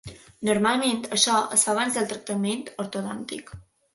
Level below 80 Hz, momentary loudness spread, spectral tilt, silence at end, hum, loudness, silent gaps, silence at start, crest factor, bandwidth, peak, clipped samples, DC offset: -60 dBFS; 14 LU; -2.5 dB/octave; 0.35 s; none; -24 LUFS; none; 0.05 s; 22 dB; 12 kHz; -4 dBFS; under 0.1%; under 0.1%